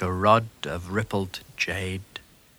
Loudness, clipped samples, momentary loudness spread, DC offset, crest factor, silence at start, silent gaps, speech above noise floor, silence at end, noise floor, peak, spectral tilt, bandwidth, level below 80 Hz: -26 LUFS; under 0.1%; 16 LU; under 0.1%; 22 dB; 0 s; none; 20 dB; 0.4 s; -46 dBFS; -4 dBFS; -5.5 dB/octave; over 20 kHz; -52 dBFS